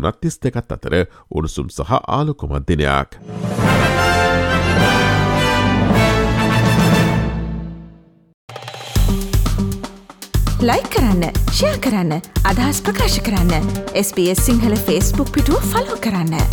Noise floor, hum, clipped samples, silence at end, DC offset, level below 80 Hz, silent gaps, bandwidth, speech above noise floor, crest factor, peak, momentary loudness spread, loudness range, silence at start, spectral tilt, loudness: -43 dBFS; none; under 0.1%; 0 s; under 0.1%; -24 dBFS; 8.34-8.48 s; 19.5 kHz; 26 dB; 14 dB; -2 dBFS; 10 LU; 6 LU; 0 s; -5 dB/octave; -17 LUFS